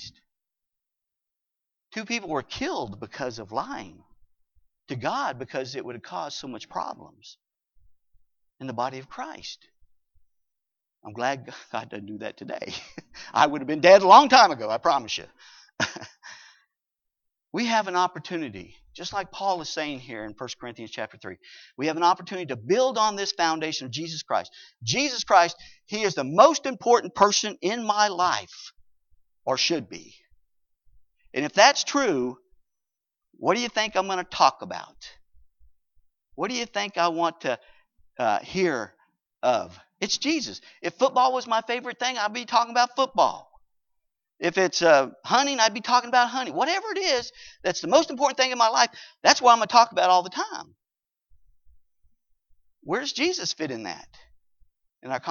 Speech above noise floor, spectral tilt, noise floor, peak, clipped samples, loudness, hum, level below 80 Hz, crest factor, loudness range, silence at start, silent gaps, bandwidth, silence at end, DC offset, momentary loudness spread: 64 dB; -2.5 dB/octave; -88 dBFS; -2 dBFS; under 0.1%; -23 LUFS; none; -66 dBFS; 24 dB; 14 LU; 0 s; none; 7.4 kHz; 0 s; under 0.1%; 18 LU